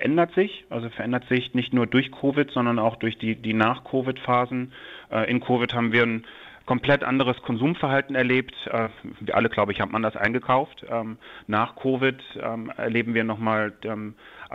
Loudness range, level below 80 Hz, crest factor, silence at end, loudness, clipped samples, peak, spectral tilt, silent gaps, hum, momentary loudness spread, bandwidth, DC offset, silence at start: 2 LU; -58 dBFS; 20 dB; 0 s; -24 LUFS; under 0.1%; -4 dBFS; -8 dB/octave; none; none; 11 LU; 6 kHz; under 0.1%; 0 s